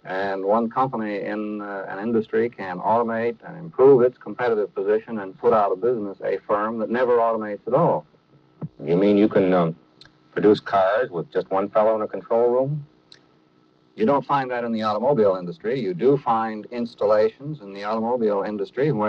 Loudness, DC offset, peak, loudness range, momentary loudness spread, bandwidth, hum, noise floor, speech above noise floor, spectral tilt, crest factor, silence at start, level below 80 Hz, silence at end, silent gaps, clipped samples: -22 LUFS; under 0.1%; -4 dBFS; 3 LU; 11 LU; 6.2 kHz; none; -59 dBFS; 37 dB; -8.5 dB/octave; 18 dB; 0.05 s; -66 dBFS; 0 s; none; under 0.1%